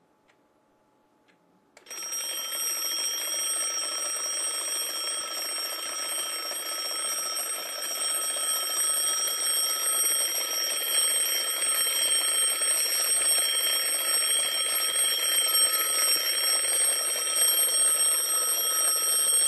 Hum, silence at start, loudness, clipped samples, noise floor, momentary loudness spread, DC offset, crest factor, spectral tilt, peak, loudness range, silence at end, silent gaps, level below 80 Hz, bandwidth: none; 1.85 s; -24 LUFS; under 0.1%; -66 dBFS; 9 LU; under 0.1%; 16 dB; 4 dB/octave; -12 dBFS; 7 LU; 0 s; none; -80 dBFS; 14 kHz